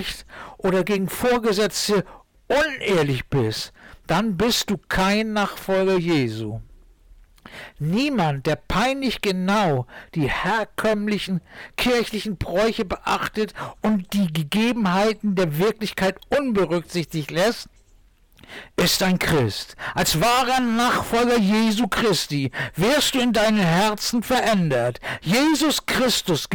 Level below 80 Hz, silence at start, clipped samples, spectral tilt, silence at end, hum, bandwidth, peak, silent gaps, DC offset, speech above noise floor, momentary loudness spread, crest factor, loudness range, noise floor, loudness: -44 dBFS; 0 s; under 0.1%; -4.5 dB/octave; 0 s; none; 19 kHz; -12 dBFS; none; under 0.1%; 33 dB; 9 LU; 10 dB; 4 LU; -54 dBFS; -21 LUFS